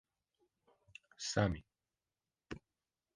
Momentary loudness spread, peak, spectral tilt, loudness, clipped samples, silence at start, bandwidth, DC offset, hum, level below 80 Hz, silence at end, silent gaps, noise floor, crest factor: 23 LU; -16 dBFS; -5 dB/octave; -38 LUFS; under 0.1%; 1.2 s; 10 kHz; under 0.1%; none; -60 dBFS; 0.55 s; none; under -90 dBFS; 28 dB